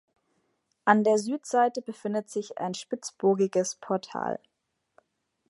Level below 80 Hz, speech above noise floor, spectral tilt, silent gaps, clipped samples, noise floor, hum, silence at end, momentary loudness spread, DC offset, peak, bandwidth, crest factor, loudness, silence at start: -80 dBFS; 53 dB; -5 dB/octave; none; under 0.1%; -80 dBFS; none; 1.15 s; 12 LU; under 0.1%; -4 dBFS; 11.5 kHz; 24 dB; -28 LUFS; 0.85 s